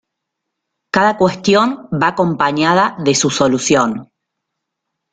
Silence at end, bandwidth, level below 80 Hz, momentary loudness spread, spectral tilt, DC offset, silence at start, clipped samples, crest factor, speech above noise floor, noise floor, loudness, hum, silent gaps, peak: 1.1 s; 9.6 kHz; -52 dBFS; 5 LU; -4 dB/octave; under 0.1%; 0.95 s; under 0.1%; 16 dB; 63 dB; -77 dBFS; -14 LUFS; none; none; 0 dBFS